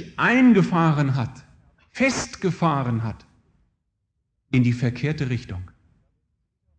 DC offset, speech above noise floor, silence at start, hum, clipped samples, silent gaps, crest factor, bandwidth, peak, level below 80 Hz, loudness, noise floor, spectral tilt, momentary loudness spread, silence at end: under 0.1%; 54 dB; 0 s; none; under 0.1%; none; 16 dB; 9.2 kHz; -6 dBFS; -52 dBFS; -22 LUFS; -75 dBFS; -6.5 dB/octave; 16 LU; 1.1 s